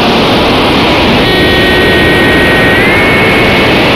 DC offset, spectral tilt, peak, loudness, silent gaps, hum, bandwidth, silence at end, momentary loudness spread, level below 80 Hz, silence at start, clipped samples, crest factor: 0.3%; -5 dB/octave; 0 dBFS; -6 LUFS; none; none; 16.5 kHz; 0 s; 1 LU; -22 dBFS; 0 s; under 0.1%; 6 dB